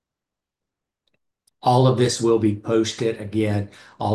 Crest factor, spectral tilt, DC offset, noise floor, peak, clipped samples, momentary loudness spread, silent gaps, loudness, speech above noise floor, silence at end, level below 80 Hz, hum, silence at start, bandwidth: 18 dB; -6 dB/octave; under 0.1%; -86 dBFS; -6 dBFS; under 0.1%; 10 LU; none; -21 LUFS; 66 dB; 0 s; -52 dBFS; none; 1.65 s; 12.5 kHz